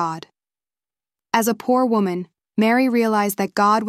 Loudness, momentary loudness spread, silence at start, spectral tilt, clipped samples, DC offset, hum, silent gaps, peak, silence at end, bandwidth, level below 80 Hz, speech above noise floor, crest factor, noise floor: -20 LUFS; 10 LU; 0 s; -5 dB/octave; under 0.1%; under 0.1%; none; none; -2 dBFS; 0 s; 16 kHz; -68 dBFS; over 71 dB; 18 dB; under -90 dBFS